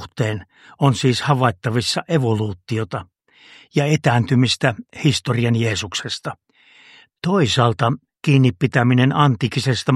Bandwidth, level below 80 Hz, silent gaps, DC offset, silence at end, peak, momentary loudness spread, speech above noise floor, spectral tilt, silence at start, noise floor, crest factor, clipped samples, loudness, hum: 12 kHz; -54 dBFS; none; under 0.1%; 0 s; 0 dBFS; 9 LU; 32 dB; -5.5 dB/octave; 0 s; -50 dBFS; 18 dB; under 0.1%; -19 LUFS; none